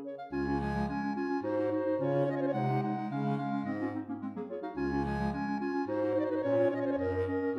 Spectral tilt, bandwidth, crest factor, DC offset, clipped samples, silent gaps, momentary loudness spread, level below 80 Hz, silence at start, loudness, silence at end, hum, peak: -9 dB/octave; 6.4 kHz; 14 dB; under 0.1%; under 0.1%; none; 6 LU; -52 dBFS; 0 s; -33 LUFS; 0 s; none; -18 dBFS